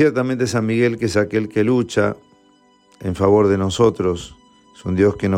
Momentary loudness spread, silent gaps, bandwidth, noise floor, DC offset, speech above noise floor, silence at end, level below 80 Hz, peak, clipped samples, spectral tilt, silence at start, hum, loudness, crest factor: 13 LU; none; 14 kHz; -54 dBFS; under 0.1%; 37 dB; 0 s; -48 dBFS; -4 dBFS; under 0.1%; -6.5 dB/octave; 0 s; none; -18 LUFS; 14 dB